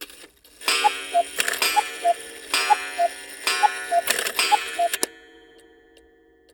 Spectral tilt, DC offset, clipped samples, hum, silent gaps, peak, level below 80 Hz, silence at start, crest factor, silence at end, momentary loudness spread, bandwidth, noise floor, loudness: 1 dB/octave; under 0.1%; under 0.1%; none; none; -2 dBFS; -64 dBFS; 0 s; 22 dB; 1.35 s; 7 LU; over 20 kHz; -56 dBFS; -22 LUFS